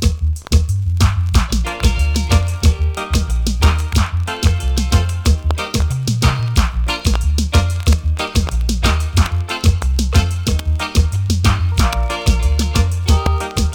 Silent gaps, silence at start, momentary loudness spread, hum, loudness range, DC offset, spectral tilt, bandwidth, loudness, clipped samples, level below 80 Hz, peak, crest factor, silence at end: none; 0 s; 3 LU; none; 1 LU; under 0.1%; -5 dB/octave; 17.5 kHz; -17 LUFS; under 0.1%; -18 dBFS; -2 dBFS; 12 dB; 0 s